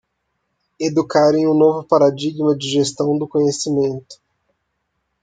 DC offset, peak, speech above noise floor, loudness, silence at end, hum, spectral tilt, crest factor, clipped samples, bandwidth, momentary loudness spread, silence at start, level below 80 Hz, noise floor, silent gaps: under 0.1%; -2 dBFS; 56 dB; -17 LUFS; 1.1 s; none; -5.5 dB/octave; 16 dB; under 0.1%; 9.4 kHz; 6 LU; 0.8 s; -62 dBFS; -72 dBFS; none